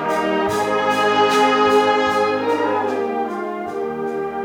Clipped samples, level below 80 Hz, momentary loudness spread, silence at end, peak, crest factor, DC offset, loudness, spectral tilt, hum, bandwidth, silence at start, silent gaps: under 0.1%; -58 dBFS; 10 LU; 0 s; -4 dBFS; 14 dB; under 0.1%; -18 LUFS; -4 dB/octave; none; 17.5 kHz; 0 s; none